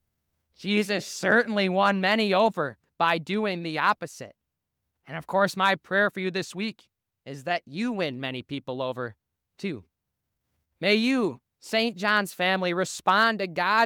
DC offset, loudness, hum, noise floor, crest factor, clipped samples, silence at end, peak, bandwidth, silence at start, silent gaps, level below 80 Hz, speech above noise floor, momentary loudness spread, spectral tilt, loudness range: under 0.1%; -25 LUFS; none; -82 dBFS; 18 dB; under 0.1%; 0 s; -8 dBFS; 18.5 kHz; 0.6 s; none; -74 dBFS; 57 dB; 14 LU; -4.5 dB/octave; 8 LU